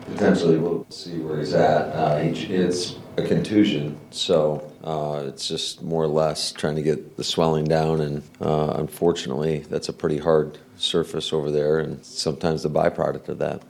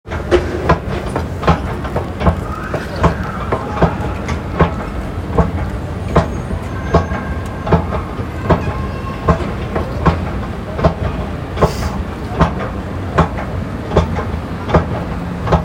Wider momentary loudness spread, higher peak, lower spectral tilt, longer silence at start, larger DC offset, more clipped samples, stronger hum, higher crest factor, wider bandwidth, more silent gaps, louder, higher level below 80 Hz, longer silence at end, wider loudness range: about the same, 8 LU vs 7 LU; second, -6 dBFS vs 0 dBFS; second, -5.5 dB/octave vs -7.5 dB/octave; about the same, 0 s vs 0.05 s; neither; neither; neither; about the same, 18 dB vs 16 dB; second, 14.5 kHz vs 16 kHz; neither; second, -23 LUFS vs -18 LUFS; second, -52 dBFS vs -26 dBFS; about the same, 0.05 s vs 0 s; about the same, 2 LU vs 1 LU